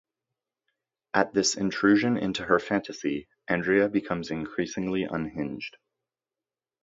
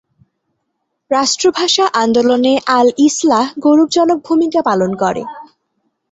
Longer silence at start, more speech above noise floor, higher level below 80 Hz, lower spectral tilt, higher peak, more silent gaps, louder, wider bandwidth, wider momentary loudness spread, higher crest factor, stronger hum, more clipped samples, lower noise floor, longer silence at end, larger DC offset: about the same, 1.15 s vs 1.1 s; first, over 64 dB vs 58 dB; about the same, -60 dBFS vs -58 dBFS; about the same, -4.5 dB/octave vs -3.5 dB/octave; second, -6 dBFS vs 0 dBFS; neither; second, -27 LUFS vs -13 LUFS; about the same, 7.8 kHz vs 8.2 kHz; first, 10 LU vs 6 LU; first, 24 dB vs 14 dB; neither; neither; first, under -90 dBFS vs -71 dBFS; first, 1.15 s vs 0.65 s; neither